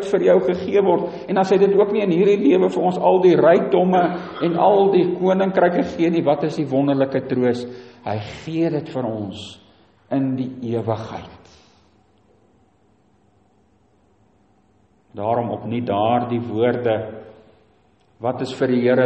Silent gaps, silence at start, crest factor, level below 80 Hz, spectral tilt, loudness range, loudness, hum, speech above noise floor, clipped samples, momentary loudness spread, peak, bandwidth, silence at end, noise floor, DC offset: none; 0 s; 18 dB; -60 dBFS; -8 dB/octave; 12 LU; -19 LUFS; none; 41 dB; under 0.1%; 13 LU; -2 dBFS; 8.4 kHz; 0 s; -59 dBFS; under 0.1%